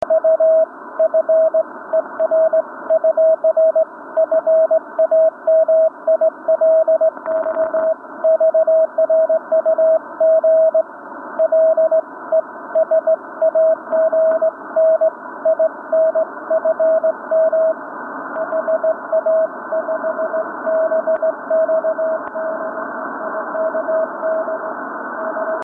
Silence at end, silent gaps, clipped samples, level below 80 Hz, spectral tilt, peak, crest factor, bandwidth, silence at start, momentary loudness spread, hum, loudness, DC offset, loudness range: 0 s; none; under 0.1%; -70 dBFS; -8 dB/octave; -6 dBFS; 10 dB; 2 kHz; 0 s; 9 LU; none; -17 LUFS; under 0.1%; 5 LU